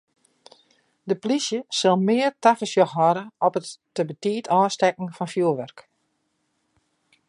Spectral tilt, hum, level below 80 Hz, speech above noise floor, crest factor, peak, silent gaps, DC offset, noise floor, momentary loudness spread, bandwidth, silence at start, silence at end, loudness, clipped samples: -5 dB/octave; none; -76 dBFS; 50 dB; 20 dB; -4 dBFS; none; under 0.1%; -73 dBFS; 11 LU; 11.5 kHz; 1.05 s; 1.5 s; -22 LUFS; under 0.1%